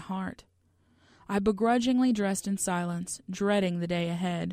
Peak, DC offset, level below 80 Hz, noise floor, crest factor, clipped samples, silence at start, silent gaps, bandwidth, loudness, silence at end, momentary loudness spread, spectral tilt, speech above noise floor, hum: -12 dBFS; under 0.1%; -60 dBFS; -67 dBFS; 16 dB; under 0.1%; 0 s; none; 15.5 kHz; -29 LUFS; 0 s; 10 LU; -5 dB/octave; 38 dB; none